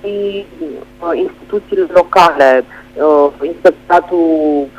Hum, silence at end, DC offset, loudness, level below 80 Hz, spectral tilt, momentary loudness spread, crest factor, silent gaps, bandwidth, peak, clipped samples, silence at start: none; 0.1 s; under 0.1%; -12 LUFS; -46 dBFS; -5.5 dB/octave; 15 LU; 12 dB; none; 15 kHz; 0 dBFS; 0.3%; 0.05 s